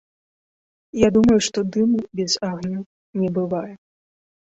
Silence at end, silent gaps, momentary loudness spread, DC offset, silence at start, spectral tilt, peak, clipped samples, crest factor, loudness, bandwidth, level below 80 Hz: 0.75 s; 2.86-3.13 s; 16 LU; under 0.1%; 0.95 s; -5 dB/octave; -2 dBFS; under 0.1%; 20 dB; -20 LUFS; 8.2 kHz; -50 dBFS